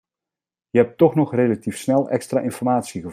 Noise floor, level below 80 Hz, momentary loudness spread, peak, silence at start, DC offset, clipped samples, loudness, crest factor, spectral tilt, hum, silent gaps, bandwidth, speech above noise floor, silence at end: -89 dBFS; -64 dBFS; 6 LU; -2 dBFS; 0.75 s; under 0.1%; under 0.1%; -20 LUFS; 18 dB; -7 dB/octave; none; none; 15.5 kHz; 70 dB; 0 s